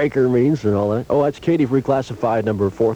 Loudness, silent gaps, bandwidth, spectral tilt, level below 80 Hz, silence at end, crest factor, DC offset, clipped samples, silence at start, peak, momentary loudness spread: -18 LUFS; none; 10 kHz; -8.5 dB/octave; -48 dBFS; 0 s; 12 dB; under 0.1%; under 0.1%; 0 s; -6 dBFS; 4 LU